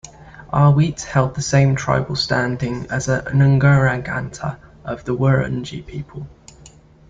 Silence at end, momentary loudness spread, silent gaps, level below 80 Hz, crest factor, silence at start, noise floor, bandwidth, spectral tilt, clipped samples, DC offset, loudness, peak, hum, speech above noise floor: 0.4 s; 17 LU; none; -42 dBFS; 16 dB; 0.05 s; -46 dBFS; 7.8 kHz; -6 dB/octave; under 0.1%; under 0.1%; -18 LUFS; -2 dBFS; none; 28 dB